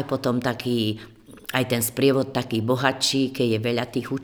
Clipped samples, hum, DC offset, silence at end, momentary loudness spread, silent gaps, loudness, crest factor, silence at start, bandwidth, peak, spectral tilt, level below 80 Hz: under 0.1%; none; under 0.1%; 0 s; 7 LU; none; -23 LUFS; 22 dB; 0 s; over 20 kHz; -2 dBFS; -4.5 dB/octave; -58 dBFS